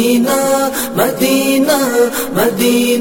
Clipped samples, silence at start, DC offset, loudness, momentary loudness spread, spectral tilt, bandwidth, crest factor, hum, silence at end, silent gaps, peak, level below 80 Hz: under 0.1%; 0 s; 0.4%; -13 LUFS; 3 LU; -3.5 dB/octave; 17 kHz; 12 dB; none; 0 s; none; -2 dBFS; -50 dBFS